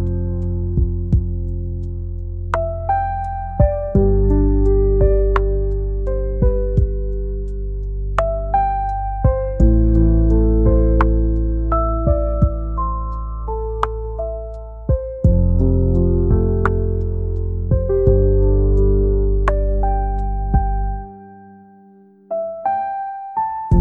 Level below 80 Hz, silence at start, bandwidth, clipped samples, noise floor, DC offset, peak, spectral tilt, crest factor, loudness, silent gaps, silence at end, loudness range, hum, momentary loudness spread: -20 dBFS; 0 s; 3.2 kHz; under 0.1%; -47 dBFS; 0.1%; -2 dBFS; -10.5 dB/octave; 14 dB; -19 LUFS; none; 0 s; 6 LU; none; 11 LU